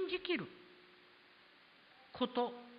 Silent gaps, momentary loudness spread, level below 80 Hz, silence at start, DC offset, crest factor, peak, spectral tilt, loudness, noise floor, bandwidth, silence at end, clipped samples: none; 25 LU; -78 dBFS; 0 s; under 0.1%; 20 dB; -22 dBFS; -2 dB/octave; -39 LUFS; -64 dBFS; 5 kHz; 0 s; under 0.1%